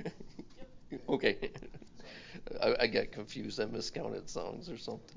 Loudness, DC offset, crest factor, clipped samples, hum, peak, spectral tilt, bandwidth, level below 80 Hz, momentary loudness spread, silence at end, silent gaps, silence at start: -36 LUFS; under 0.1%; 24 dB; under 0.1%; none; -14 dBFS; -4.5 dB/octave; 7.6 kHz; -60 dBFS; 21 LU; 0 s; none; 0 s